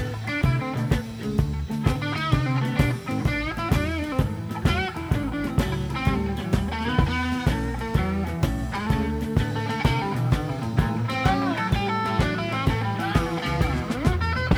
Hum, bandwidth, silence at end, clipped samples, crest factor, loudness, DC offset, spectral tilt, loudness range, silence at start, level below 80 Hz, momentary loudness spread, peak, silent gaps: none; over 20 kHz; 0 s; under 0.1%; 18 dB; -25 LUFS; under 0.1%; -6.5 dB/octave; 1 LU; 0 s; -32 dBFS; 3 LU; -6 dBFS; none